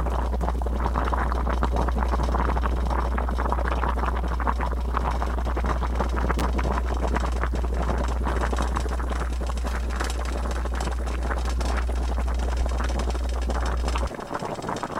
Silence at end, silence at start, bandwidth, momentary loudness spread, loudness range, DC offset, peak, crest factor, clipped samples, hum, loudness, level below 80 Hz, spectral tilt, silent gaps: 0 s; 0 s; 12 kHz; 3 LU; 2 LU; under 0.1%; -8 dBFS; 18 dB; under 0.1%; none; -27 LUFS; -26 dBFS; -6 dB/octave; none